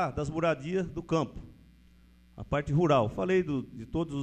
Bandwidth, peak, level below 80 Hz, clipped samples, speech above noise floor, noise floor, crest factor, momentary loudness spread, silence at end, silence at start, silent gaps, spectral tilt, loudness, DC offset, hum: 9.2 kHz; -12 dBFS; -50 dBFS; under 0.1%; 29 dB; -58 dBFS; 20 dB; 11 LU; 0 s; 0 s; none; -7.5 dB/octave; -30 LUFS; under 0.1%; none